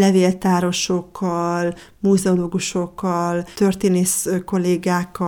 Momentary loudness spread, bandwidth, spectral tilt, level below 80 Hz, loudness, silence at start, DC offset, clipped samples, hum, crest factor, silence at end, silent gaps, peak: 6 LU; 19 kHz; -5 dB/octave; -52 dBFS; -20 LUFS; 0 s; under 0.1%; under 0.1%; none; 14 dB; 0 s; none; -4 dBFS